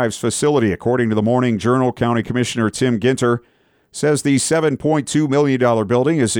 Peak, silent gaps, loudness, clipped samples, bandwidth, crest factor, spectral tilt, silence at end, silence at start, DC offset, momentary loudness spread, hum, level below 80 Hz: -4 dBFS; none; -17 LUFS; under 0.1%; 17 kHz; 12 dB; -5.5 dB/octave; 0 s; 0 s; under 0.1%; 4 LU; none; -52 dBFS